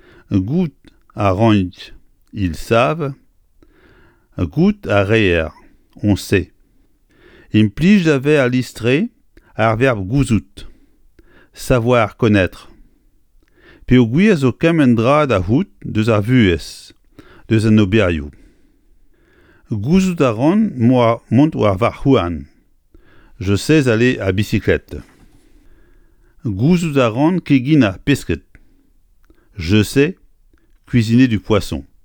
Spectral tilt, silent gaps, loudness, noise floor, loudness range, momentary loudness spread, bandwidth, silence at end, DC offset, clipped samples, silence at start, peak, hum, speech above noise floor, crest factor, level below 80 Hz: -7 dB/octave; none; -15 LUFS; -54 dBFS; 4 LU; 13 LU; 18.5 kHz; 0.2 s; under 0.1%; under 0.1%; 0.3 s; 0 dBFS; none; 40 dB; 16 dB; -38 dBFS